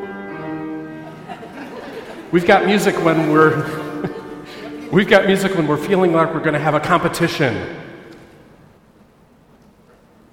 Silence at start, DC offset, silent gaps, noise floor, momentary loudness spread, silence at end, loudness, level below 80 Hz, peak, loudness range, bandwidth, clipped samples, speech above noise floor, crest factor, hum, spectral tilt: 0 s; under 0.1%; none; -50 dBFS; 20 LU; 2.1 s; -17 LUFS; -52 dBFS; 0 dBFS; 5 LU; 17 kHz; under 0.1%; 35 dB; 18 dB; none; -6 dB/octave